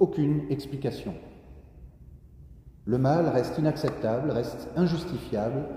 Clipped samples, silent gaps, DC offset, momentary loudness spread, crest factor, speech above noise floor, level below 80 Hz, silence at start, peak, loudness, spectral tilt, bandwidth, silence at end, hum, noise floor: under 0.1%; none; under 0.1%; 13 LU; 20 dB; 22 dB; -50 dBFS; 0 s; -8 dBFS; -28 LUFS; -8 dB/octave; 15.5 kHz; 0 s; none; -49 dBFS